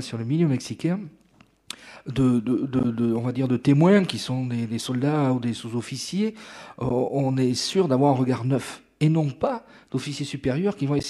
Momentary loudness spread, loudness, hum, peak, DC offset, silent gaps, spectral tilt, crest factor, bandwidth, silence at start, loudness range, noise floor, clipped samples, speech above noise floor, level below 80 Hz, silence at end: 11 LU; -24 LUFS; none; -8 dBFS; under 0.1%; none; -6.5 dB/octave; 16 dB; 12.5 kHz; 0 s; 3 LU; -44 dBFS; under 0.1%; 21 dB; -54 dBFS; 0 s